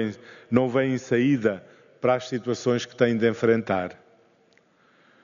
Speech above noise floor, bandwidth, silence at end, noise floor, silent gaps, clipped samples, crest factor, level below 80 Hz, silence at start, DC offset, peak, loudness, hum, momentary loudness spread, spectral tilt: 38 dB; 7.2 kHz; 1.3 s; -61 dBFS; none; under 0.1%; 20 dB; -68 dBFS; 0 s; under 0.1%; -4 dBFS; -24 LUFS; none; 8 LU; -5.5 dB/octave